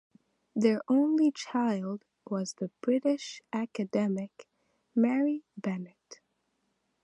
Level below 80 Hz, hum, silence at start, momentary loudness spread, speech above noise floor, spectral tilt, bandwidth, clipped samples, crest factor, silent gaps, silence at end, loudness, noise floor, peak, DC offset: -84 dBFS; none; 0.55 s; 12 LU; 48 dB; -6 dB/octave; 11 kHz; under 0.1%; 18 dB; none; 0.9 s; -30 LUFS; -78 dBFS; -12 dBFS; under 0.1%